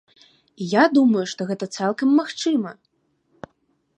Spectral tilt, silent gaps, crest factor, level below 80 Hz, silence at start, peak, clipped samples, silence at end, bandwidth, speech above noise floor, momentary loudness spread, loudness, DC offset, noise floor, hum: -5 dB/octave; none; 20 dB; -72 dBFS; 0.6 s; -2 dBFS; under 0.1%; 1.25 s; 9.6 kHz; 48 dB; 11 LU; -20 LUFS; under 0.1%; -67 dBFS; none